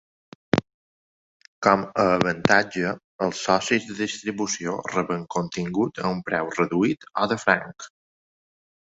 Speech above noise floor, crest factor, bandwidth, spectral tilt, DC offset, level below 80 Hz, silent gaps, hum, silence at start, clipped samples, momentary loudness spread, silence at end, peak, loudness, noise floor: over 66 dB; 24 dB; 8 kHz; -4.5 dB/octave; under 0.1%; -58 dBFS; 0.74-1.40 s, 1.47-1.62 s, 3.04-3.19 s; none; 0.55 s; under 0.1%; 8 LU; 1.05 s; -2 dBFS; -24 LUFS; under -90 dBFS